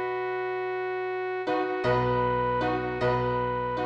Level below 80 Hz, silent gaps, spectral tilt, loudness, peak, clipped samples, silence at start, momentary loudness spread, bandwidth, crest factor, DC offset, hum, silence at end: -48 dBFS; none; -8 dB/octave; -28 LUFS; -12 dBFS; under 0.1%; 0 s; 5 LU; 7.6 kHz; 16 dB; under 0.1%; none; 0 s